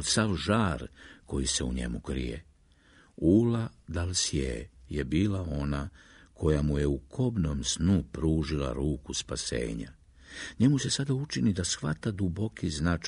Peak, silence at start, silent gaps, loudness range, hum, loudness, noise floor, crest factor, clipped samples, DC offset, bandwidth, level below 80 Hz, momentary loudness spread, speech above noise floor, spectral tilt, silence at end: -12 dBFS; 0 s; none; 2 LU; none; -30 LUFS; -60 dBFS; 18 dB; under 0.1%; under 0.1%; 11 kHz; -42 dBFS; 11 LU; 31 dB; -5 dB/octave; 0 s